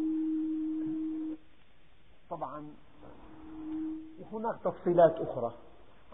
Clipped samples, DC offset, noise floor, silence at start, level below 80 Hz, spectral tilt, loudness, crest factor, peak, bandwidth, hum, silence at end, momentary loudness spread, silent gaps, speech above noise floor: under 0.1%; 0.3%; -64 dBFS; 0 s; -64 dBFS; -5 dB/octave; -33 LUFS; 22 dB; -12 dBFS; 3.8 kHz; none; 0.55 s; 23 LU; none; 34 dB